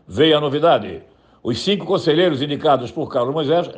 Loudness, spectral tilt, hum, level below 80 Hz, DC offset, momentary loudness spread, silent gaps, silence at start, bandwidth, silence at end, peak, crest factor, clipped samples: -18 LUFS; -6 dB/octave; none; -58 dBFS; under 0.1%; 10 LU; none; 0.1 s; 9.4 kHz; 0 s; -4 dBFS; 14 dB; under 0.1%